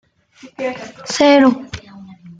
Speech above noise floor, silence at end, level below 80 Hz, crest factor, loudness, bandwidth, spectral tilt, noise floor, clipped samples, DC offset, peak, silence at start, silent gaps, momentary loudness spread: 24 dB; 0.05 s; -52 dBFS; 16 dB; -15 LUFS; 9.2 kHz; -4 dB/octave; -38 dBFS; under 0.1%; under 0.1%; -2 dBFS; 0.45 s; none; 21 LU